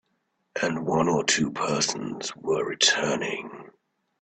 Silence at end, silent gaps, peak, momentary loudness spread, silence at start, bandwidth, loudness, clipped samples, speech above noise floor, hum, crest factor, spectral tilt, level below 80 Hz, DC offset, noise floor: 0.5 s; none; -6 dBFS; 12 LU; 0.55 s; 9.4 kHz; -25 LUFS; under 0.1%; 49 dB; none; 20 dB; -2.5 dB/octave; -64 dBFS; under 0.1%; -74 dBFS